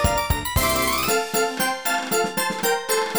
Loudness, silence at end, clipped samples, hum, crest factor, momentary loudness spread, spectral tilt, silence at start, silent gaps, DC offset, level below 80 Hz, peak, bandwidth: -21 LUFS; 0 s; under 0.1%; none; 16 dB; 3 LU; -3 dB/octave; 0 s; none; 0.4%; -34 dBFS; -6 dBFS; over 20 kHz